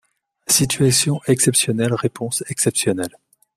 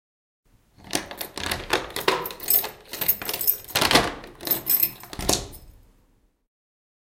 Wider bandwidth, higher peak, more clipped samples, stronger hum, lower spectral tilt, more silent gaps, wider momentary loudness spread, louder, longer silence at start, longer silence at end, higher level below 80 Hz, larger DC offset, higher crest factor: about the same, 16 kHz vs 17 kHz; about the same, -2 dBFS vs 0 dBFS; neither; neither; first, -3.5 dB/octave vs -2 dB/octave; neither; about the same, 9 LU vs 11 LU; first, -18 LUFS vs -23 LUFS; second, 0.5 s vs 0.85 s; second, 0.5 s vs 1.5 s; about the same, -52 dBFS vs -48 dBFS; neither; second, 18 dB vs 26 dB